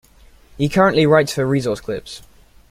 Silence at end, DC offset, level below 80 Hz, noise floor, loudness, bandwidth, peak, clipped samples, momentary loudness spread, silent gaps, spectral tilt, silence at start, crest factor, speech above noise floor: 0.55 s; under 0.1%; -46 dBFS; -48 dBFS; -17 LUFS; 16 kHz; 0 dBFS; under 0.1%; 16 LU; none; -6 dB/octave; 0.6 s; 18 dB; 31 dB